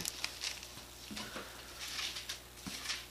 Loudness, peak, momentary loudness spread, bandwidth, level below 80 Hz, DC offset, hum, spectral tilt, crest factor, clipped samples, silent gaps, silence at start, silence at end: -42 LUFS; -12 dBFS; 8 LU; 15.5 kHz; -62 dBFS; under 0.1%; none; -1 dB/octave; 32 dB; under 0.1%; none; 0 s; 0 s